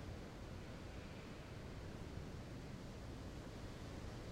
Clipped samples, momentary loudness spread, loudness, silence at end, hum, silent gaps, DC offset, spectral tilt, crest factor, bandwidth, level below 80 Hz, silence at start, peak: under 0.1%; 2 LU; -52 LUFS; 0 s; none; none; under 0.1%; -6 dB/octave; 14 dB; 16 kHz; -58 dBFS; 0 s; -36 dBFS